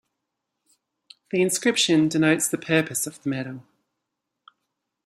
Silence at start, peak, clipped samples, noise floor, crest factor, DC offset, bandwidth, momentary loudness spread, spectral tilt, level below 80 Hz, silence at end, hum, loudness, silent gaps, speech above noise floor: 1.35 s; -6 dBFS; under 0.1%; -82 dBFS; 20 dB; under 0.1%; 16 kHz; 11 LU; -3.5 dB/octave; -68 dBFS; 1.45 s; none; -22 LUFS; none; 59 dB